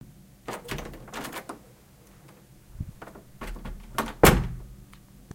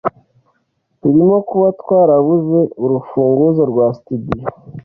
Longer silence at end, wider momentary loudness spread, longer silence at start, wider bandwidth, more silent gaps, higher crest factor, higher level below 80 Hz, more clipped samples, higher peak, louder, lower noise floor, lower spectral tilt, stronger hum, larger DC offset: about the same, 0.15 s vs 0.05 s; first, 26 LU vs 12 LU; about the same, 0.05 s vs 0.05 s; first, 17 kHz vs 4.8 kHz; neither; first, 30 dB vs 12 dB; first, -38 dBFS vs -48 dBFS; neither; about the same, 0 dBFS vs -2 dBFS; second, -27 LUFS vs -14 LUFS; second, -54 dBFS vs -65 dBFS; second, -4.5 dB/octave vs -12.5 dB/octave; neither; neither